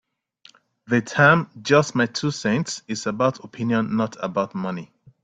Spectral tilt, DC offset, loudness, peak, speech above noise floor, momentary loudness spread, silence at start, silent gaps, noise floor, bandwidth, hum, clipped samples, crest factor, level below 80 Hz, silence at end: -5.5 dB/octave; under 0.1%; -22 LUFS; -2 dBFS; 33 dB; 12 LU; 0.9 s; none; -55 dBFS; 9.4 kHz; none; under 0.1%; 20 dB; -62 dBFS; 0.4 s